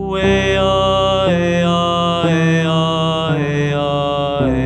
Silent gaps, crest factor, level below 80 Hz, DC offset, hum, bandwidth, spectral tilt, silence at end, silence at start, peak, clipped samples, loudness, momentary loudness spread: none; 12 dB; -34 dBFS; under 0.1%; none; 8.8 kHz; -6 dB/octave; 0 s; 0 s; -2 dBFS; under 0.1%; -15 LUFS; 3 LU